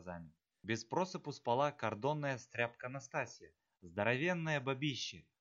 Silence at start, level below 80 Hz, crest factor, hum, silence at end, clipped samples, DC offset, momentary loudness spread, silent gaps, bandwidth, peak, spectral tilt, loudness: 0 s; -78 dBFS; 22 dB; none; 0.2 s; under 0.1%; under 0.1%; 12 LU; none; 7.8 kHz; -18 dBFS; -5 dB/octave; -39 LUFS